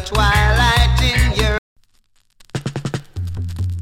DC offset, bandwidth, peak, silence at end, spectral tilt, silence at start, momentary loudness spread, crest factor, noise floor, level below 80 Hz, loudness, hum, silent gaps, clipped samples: under 0.1%; 16 kHz; -2 dBFS; 0 s; -4.5 dB/octave; 0 s; 13 LU; 16 dB; -57 dBFS; -22 dBFS; -17 LUFS; none; 1.58-1.76 s; under 0.1%